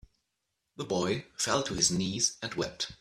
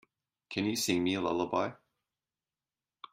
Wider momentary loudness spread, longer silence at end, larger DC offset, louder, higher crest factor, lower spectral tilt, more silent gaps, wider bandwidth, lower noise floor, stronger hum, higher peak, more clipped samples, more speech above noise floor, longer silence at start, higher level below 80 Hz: about the same, 8 LU vs 7 LU; about the same, 0.05 s vs 0.05 s; neither; about the same, -30 LUFS vs -32 LUFS; about the same, 22 dB vs 20 dB; about the same, -3 dB/octave vs -4 dB/octave; neither; about the same, 14.5 kHz vs 15.5 kHz; second, -83 dBFS vs under -90 dBFS; neither; first, -12 dBFS vs -16 dBFS; neither; second, 52 dB vs over 59 dB; first, 0.8 s vs 0.5 s; first, -58 dBFS vs -72 dBFS